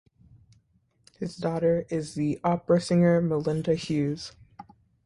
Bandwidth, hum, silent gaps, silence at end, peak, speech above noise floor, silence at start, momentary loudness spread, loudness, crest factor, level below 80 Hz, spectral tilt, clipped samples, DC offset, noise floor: 11 kHz; none; none; 0.45 s; -10 dBFS; 42 dB; 1.2 s; 14 LU; -26 LUFS; 18 dB; -60 dBFS; -7 dB/octave; under 0.1%; under 0.1%; -67 dBFS